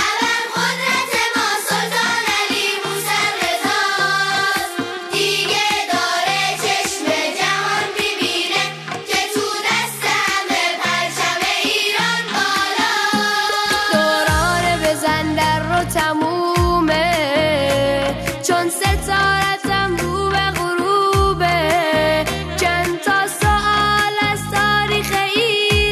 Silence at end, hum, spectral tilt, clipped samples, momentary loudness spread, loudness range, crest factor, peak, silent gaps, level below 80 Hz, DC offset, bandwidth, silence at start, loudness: 0 s; none; -3 dB/octave; under 0.1%; 3 LU; 2 LU; 12 dB; -6 dBFS; none; -34 dBFS; under 0.1%; 14 kHz; 0 s; -17 LUFS